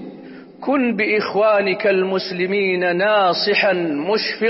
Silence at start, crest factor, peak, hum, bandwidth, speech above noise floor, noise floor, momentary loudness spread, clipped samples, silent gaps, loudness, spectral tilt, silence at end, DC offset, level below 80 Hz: 0 s; 12 dB; -6 dBFS; none; 6 kHz; 20 dB; -38 dBFS; 6 LU; under 0.1%; none; -18 LUFS; -8 dB/octave; 0 s; under 0.1%; -66 dBFS